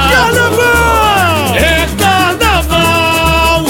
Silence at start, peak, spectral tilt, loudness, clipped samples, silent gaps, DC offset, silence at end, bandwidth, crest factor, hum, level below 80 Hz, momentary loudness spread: 0 s; 0 dBFS; -4 dB/octave; -9 LUFS; under 0.1%; none; 0.6%; 0 s; 17 kHz; 10 dB; none; -20 dBFS; 2 LU